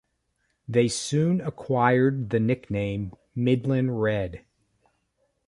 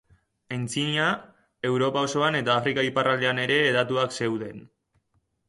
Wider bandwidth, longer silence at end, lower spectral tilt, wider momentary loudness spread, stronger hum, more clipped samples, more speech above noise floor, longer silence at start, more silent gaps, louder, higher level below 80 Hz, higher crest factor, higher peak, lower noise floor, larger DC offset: about the same, 11.5 kHz vs 11.5 kHz; first, 1.1 s vs 0.8 s; first, -6.5 dB/octave vs -4.5 dB/octave; about the same, 9 LU vs 11 LU; neither; neither; about the same, 50 dB vs 47 dB; first, 0.7 s vs 0.5 s; neither; about the same, -25 LUFS vs -24 LUFS; first, -54 dBFS vs -66 dBFS; about the same, 20 dB vs 18 dB; about the same, -6 dBFS vs -8 dBFS; about the same, -74 dBFS vs -72 dBFS; neither